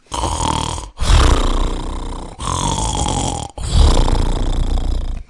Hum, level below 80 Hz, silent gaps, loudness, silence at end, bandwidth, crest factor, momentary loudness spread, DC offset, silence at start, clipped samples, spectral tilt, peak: none; -18 dBFS; none; -19 LUFS; 0.05 s; 11.5 kHz; 16 dB; 11 LU; under 0.1%; 0.1 s; under 0.1%; -4.5 dB/octave; 0 dBFS